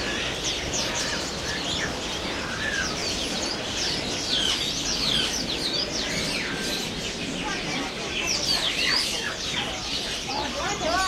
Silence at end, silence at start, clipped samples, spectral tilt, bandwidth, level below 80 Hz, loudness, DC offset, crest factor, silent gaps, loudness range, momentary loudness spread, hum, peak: 0 s; 0 s; under 0.1%; -2 dB/octave; 16 kHz; -44 dBFS; -25 LUFS; under 0.1%; 16 dB; none; 2 LU; 6 LU; none; -10 dBFS